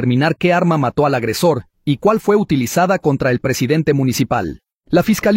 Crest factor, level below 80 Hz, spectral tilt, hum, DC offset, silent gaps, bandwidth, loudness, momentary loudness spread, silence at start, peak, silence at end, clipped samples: 14 dB; -44 dBFS; -6 dB/octave; none; under 0.1%; 4.74-4.81 s; 16.5 kHz; -16 LUFS; 4 LU; 0 s; -2 dBFS; 0 s; under 0.1%